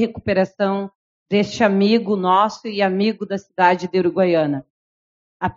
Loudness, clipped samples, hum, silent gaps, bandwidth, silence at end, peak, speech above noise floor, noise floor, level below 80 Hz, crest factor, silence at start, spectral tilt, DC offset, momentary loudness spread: -19 LUFS; under 0.1%; none; 0.95-1.26 s, 4.70-5.40 s; 7.6 kHz; 0.05 s; -2 dBFS; over 72 dB; under -90 dBFS; -56 dBFS; 18 dB; 0 s; -4.5 dB/octave; under 0.1%; 10 LU